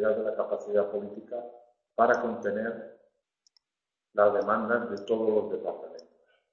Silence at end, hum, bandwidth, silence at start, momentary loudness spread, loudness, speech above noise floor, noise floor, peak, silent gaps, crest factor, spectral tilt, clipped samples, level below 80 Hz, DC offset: 0.5 s; none; 7.2 kHz; 0 s; 18 LU; -29 LUFS; 61 dB; -90 dBFS; -8 dBFS; none; 22 dB; -6.5 dB/octave; under 0.1%; -72 dBFS; under 0.1%